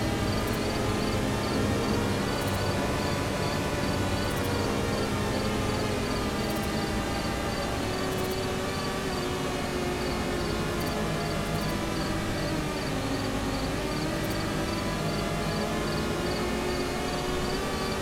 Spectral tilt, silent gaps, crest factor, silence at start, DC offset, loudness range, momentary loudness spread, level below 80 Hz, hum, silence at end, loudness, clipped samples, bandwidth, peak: -5 dB/octave; none; 14 dB; 0 s; under 0.1%; 2 LU; 2 LU; -40 dBFS; none; 0 s; -29 LUFS; under 0.1%; 17 kHz; -16 dBFS